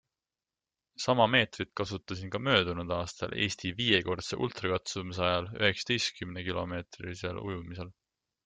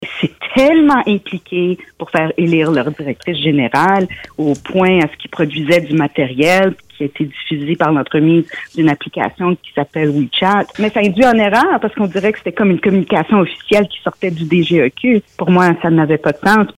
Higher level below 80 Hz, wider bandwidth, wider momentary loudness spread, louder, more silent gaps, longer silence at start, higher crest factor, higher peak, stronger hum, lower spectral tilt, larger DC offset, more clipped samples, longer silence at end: second, -62 dBFS vs -50 dBFS; second, 9.4 kHz vs 16.5 kHz; first, 12 LU vs 9 LU; second, -31 LUFS vs -14 LUFS; neither; first, 1 s vs 0 s; first, 24 dB vs 12 dB; second, -8 dBFS vs -2 dBFS; neither; second, -4 dB/octave vs -6.5 dB/octave; neither; neither; first, 0.55 s vs 0.1 s